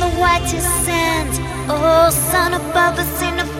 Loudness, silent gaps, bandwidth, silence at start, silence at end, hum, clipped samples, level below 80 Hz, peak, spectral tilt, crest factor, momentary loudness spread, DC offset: -16 LUFS; none; 16.5 kHz; 0 s; 0 s; none; under 0.1%; -30 dBFS; -2 dBFS; -3.5 dB/octave; 14 dB; 7 LU; under 0.1%